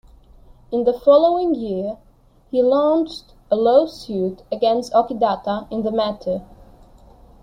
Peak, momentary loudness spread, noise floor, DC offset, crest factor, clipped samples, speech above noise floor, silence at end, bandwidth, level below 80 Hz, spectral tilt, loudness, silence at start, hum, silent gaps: -2 dBFS; 12 LU; -47 dBFS; under 0.1%; 18 dB; under 0.1%; 29 dB; 1 s; 10 kHz; -50 dBFS; -6.5 dB/octave; -19 LUFS; 0.7 s; none; none